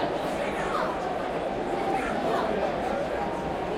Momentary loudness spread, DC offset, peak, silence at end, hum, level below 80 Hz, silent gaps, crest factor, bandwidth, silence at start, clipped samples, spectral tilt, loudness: 3 LU; under 0.1%; -14 dBFS; 0 s; none; -48 dBFS; none; 14 dB; 16 kHz; 0 s; under 0.1%; -5.5 dB/octave; -28 LUFS